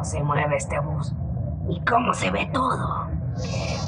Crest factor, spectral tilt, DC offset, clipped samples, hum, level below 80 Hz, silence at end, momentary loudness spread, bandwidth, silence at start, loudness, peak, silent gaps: 18 dB; -5.5 dB/octave; under 0.1%; under 0.1%; none; -38 dBFS; 0 s; 7 LU; 10.5 kHz; 0 s; -25 LUFS; -8 dBFS; none